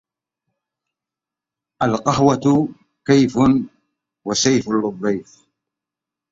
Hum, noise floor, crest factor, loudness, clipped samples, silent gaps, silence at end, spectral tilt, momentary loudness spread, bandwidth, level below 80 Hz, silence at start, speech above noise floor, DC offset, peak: none; -87 dBFS; 18 dB; -18 LUFS; under 0.1%; none; 1.1 s; -5 dB/octave; 12 LU; 7.8 kHz; -52 dBFS; 1.8 s; 70 dB; under 0.1%; -2 dBFS